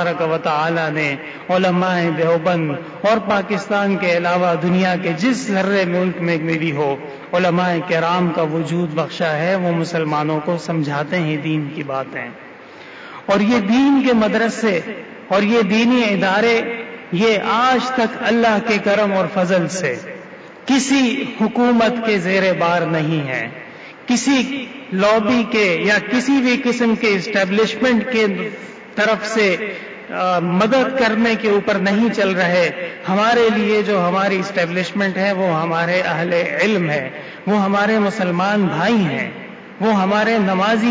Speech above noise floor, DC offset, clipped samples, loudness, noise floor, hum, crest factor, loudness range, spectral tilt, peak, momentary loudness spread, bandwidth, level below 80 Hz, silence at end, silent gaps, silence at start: 21 dB; under 0.1%; under 0.1%; -17 LUFS; -38 dBFS; none; 12 dB; 3 LU; -5.5 dB/octave; -6 dBFS; 9 LU; 8 kHz; -58 dBFS; 0 s; none; 0 s